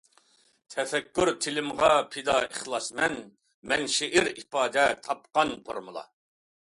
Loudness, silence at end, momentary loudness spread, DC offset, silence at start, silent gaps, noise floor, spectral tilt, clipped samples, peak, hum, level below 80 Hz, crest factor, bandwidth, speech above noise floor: -27 LUFS; 0.7 s; 14 LU; under 0.1%; 0.7 s; 3.54-3.62 s; -64 dBFS; -2.5 dB/octave; under 0.1%; -8 dBFS; none; -60 dBFS; 20 dB; 11.5 kHz; 36 dB